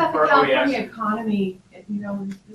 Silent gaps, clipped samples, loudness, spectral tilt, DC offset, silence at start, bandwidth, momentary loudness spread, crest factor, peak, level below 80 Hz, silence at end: none; under 0.1%; -21 LUFS; -6.5 dB/octave; under 0.1%; 0 s; 12.5 kHz; 15 LU; 20 dB; -2 dBFS; -60 dBFS; 0 s